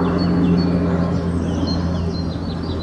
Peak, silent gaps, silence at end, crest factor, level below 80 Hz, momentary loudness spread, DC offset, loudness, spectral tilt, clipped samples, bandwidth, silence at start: -6 dBFS; none; 0 s; 12 dB; -36 dBFS; 8 LU; under 0.1%; -20 LUFS; -8 dB/octave; under 0.1%; 8.6 kHz; 0 s